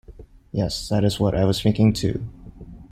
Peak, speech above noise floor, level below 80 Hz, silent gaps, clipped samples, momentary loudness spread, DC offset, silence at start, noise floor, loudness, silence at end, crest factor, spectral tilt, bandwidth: -6 dBFS; 24 dB; -40 dBFS; none; under 0.1%; 13 LU; under 0.1%; 0.1 s; -44 dBFS; -22 LUFS; 0.05 s; 16 dB; -6.5 dB/octave; 14.5 kHz